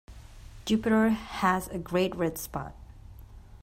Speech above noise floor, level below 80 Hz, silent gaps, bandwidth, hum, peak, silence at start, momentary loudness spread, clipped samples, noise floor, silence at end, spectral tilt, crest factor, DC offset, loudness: 20 dB; -48 dBFS; none; 16 kHz; none; -12 dBFS; 0.1 s; 14 LU; under 0.1%; -48 dBFS; 0.05 s; -5.5 dB/octave; 18 dB; under 0.1%; -28 LUFS